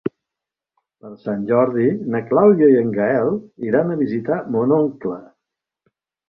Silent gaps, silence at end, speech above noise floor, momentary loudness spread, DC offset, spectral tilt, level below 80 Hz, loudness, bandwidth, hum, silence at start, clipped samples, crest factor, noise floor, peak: none; 1.05 s; 68 dB; 14 LU; under 0.1%; -11.5 dB/octave; -62 dBFS; -18 LUFS; 5.2 kHz; none; 0.05 s; under 0.1%; 16 dB; -86 dBFS; -2 dBFS